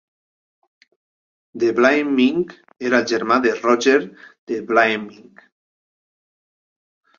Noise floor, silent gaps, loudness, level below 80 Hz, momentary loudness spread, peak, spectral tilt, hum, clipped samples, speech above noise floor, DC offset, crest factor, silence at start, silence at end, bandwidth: under -90 dBFS; 4.38-4.47 s; -18 LUFS; -66 dBFS; 13 LU; -2 dBFS; -4.5 dB/octave; none; under 0.1%; over 72 dB; under 0.1%; 20 dB; 1.55 s; 2.05 s; 7.4 kHz